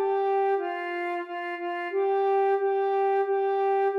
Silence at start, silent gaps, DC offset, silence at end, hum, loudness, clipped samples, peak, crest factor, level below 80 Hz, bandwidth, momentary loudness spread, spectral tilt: 0 s; none; under 0.1%; 0 s; none; -26 LUFS; under 0.1%; -16 dBFS; 10 dB; under -90 dBFS; 5.2 kHz; 7 LU; -4 dB/octave